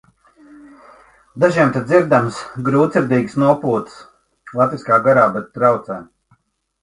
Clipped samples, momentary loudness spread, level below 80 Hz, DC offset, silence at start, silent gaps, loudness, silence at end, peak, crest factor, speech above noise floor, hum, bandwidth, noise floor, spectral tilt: under 0.1%; 11 LU; -56 dBFS; under 0.1%; 1.35 s; none; -16 LUFS; 0.8 s; 0 dBFS; 18 dB; 45 dB; none; 11.5 kHz; -61 dBFS; -7.5 dB/octave